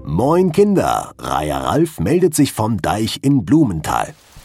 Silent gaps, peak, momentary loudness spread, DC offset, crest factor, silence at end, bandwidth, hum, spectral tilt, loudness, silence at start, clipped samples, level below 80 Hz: none; -2 dBFS; 7 LU; under 0.1%; 14 dB; 0.05 s; 16.5 kHz; none; -6 dB/octave; -16 LUFS; 0 s; under 0.1%; -40 dBFS